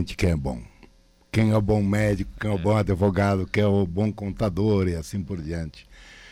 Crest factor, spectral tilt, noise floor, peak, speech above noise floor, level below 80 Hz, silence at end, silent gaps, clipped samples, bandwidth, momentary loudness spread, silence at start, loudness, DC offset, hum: 14 dB; -7.5 dB/octave; -54 dBFS; -10 dBFS; 31 dB; -40 dBFS; 0.05 s; none; under 0.1%; 12.5 kHz; 10 LU; 0 s; -24 LUFS; under 0.1%; none